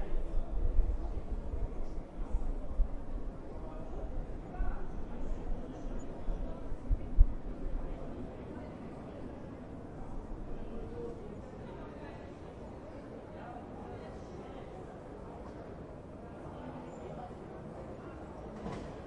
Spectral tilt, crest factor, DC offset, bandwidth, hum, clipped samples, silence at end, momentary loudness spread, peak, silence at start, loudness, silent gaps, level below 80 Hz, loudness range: -8.5 dB/octave; 26 dB; under 0.1%; 4.4 kHz; none; under 0.1%; 0 s; 8 LU; -10 dBFS; 0 s; -43 LUFS; none; -38 dBFS; 7 LU